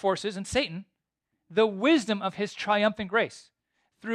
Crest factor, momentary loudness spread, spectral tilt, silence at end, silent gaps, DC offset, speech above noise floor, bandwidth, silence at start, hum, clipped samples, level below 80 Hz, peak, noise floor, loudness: 18 dB; 10 LU; -4.5 dB/octave; 0 s; none; under 0.1%; 55 dB; 11.5 kHz; 0.05 s; none; under 0.1%; -60 dBFS; -10 dBFS; -82 dBFS; -27 LUFS